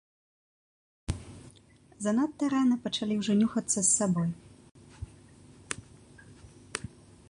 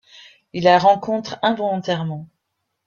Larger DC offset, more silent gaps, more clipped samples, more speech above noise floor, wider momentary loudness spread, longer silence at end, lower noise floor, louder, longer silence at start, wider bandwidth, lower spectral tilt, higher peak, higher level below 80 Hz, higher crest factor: neither; first, 4.71-4.75 s vs none; neither; second, 31 dB vs 57 dB; first, 22 LU vs 15 LU; second, 0.4 s vs 0.6 s; second, -58 dBFS vs -76 dBFS; second, -29 LUFS vs -19 LUFS; first, 1.1 s vs 0.55 s; first, 11.5 kHz vs 7.2 kHz; second, -4 dB/octave vs -6 dB/octave; second, -10 dBFS vs -2 dBFS; first, -54 dBFS vs -64 dBFS; about the same, 22 dB vs 18 dB